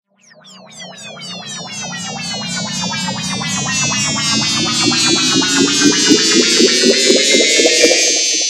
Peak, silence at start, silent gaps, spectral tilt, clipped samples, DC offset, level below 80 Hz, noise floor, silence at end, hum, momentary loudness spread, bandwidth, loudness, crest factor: 0 dBFS; 0.45 s; none; -1.5 dB/octave; under 0.1%; under 0.1%; -54 dBFS; -44 dBFS; 0 s; none; 16 LU; 17 kHz; -12 LUFS; 14 dB